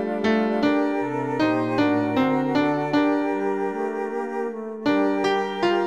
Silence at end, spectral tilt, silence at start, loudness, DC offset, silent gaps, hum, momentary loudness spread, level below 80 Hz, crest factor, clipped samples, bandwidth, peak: 0 s; -6.5 dB/octave; 0 s; -23 LUFS; 0.2%; none; none; 6 LU; -62 dBFS; 14 dB; under 0.1%; 9.4 kHz; -8 dBFS